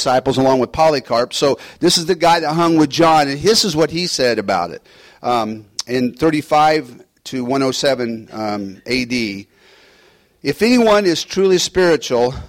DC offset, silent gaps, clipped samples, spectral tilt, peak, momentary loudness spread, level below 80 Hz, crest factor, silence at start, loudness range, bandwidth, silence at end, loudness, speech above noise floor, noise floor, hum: under 0.1%; none; under 0.1%; -4 dB/octave; -2 dBFS; 12 LU; -46 dBFS; 14 dB; 0 s; 6 LU; 16.5 kHz; 0 s; -16 LUFS; 36 dB; -52 dBFS; none